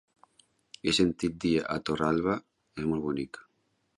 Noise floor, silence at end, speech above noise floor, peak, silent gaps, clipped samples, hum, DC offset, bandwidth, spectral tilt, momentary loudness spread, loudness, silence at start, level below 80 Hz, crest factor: -74 dBFS; 0.55 s; 46 dB; -12 dBFS; none; under 0.1%; none; under 0.1%; 11.5 kHz; -5 dB/octave; 11 LU; -29 LUFS; 0.85 s; -56 dBFS; 18 dB